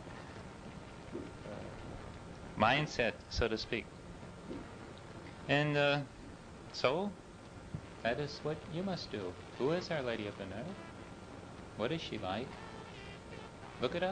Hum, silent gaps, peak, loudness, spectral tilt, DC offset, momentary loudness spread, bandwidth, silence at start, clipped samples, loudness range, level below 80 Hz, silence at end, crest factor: none; none; -14 dBFS; -38 LUFS; -5.5 dB/octave; under 0.1%; 18 LU; 10 kHz; 0 s; under 0.1%; 5 LU; -56 dBFS; 0 s; 24 dB